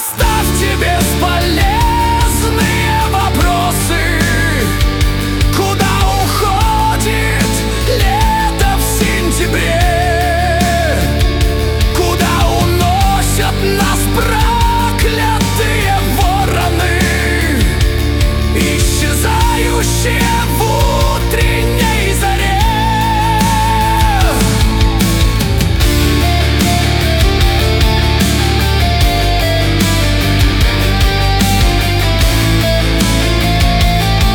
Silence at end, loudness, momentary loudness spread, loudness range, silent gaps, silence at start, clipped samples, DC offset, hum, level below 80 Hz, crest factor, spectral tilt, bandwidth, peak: 0 s; -12 LUFS; 2 LU; 1 LU; none; 0 s; under 0.1%; under 0.1%; none; -16 dBFS; 10 dB; -4.5 dB/octave; 19 kHz; -2 dBFS